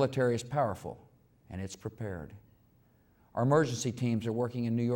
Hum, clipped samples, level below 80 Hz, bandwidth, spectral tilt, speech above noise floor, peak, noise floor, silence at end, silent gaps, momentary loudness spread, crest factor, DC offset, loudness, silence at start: none; under 0.1%; -66 dBFS; 16.5 kHz; -6.5 dB/octave; 34 dB; -14 dBFS; -65 dBFS; 0 s; none; 17 LU; 18 dB; under 0.1%; -32 LUFS; 0 s